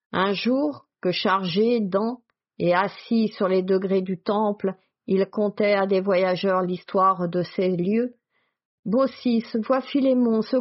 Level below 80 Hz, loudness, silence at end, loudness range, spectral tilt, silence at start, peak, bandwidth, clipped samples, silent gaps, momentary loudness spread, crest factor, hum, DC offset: -68 dBFS; -23 LUFS; 0 s; 1 LU; -5 dB/octave; 0.15 s; -8 dBFS; 6 kHz; under 0.1%; 8.65-8.83 s; 6 LU; 16 dB; none; under 0.1%